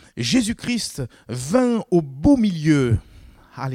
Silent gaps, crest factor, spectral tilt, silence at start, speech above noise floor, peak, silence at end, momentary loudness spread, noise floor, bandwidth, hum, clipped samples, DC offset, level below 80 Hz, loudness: none; 16 dB; -5.5 dB/octave; 0.15 s; 26 dB; -4 dBFS; 0 s; 13 LU; -45 dBFS; 15.5 kHz; none; under 0.1%; under 0.1%; -40 dBFS; -20 LUFS